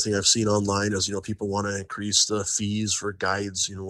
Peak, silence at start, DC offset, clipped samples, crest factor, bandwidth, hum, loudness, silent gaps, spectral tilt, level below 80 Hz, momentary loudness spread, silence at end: -6 dBFS; 0 s; under 0.1%; under 0.1%; 20 dB; 12.5 kHz; none; -24 LUFS; none; -3 dB/octave; -56 dBFS; 9 LU; 0 s